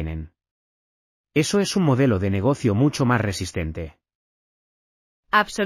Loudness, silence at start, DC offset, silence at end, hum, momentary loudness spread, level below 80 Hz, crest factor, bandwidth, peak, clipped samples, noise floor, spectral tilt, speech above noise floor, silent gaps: -22 LUFS; 0 s; under 0.1%; 0 s; none; 12 LU; -44 dBFS; 18 dB; 15 kHz; -4 dBFS; under 0.1%; under -90 dBFS; -5.5 dB/octave; over 69 dB; 0.51-1.24 s, 4.15-5.23 s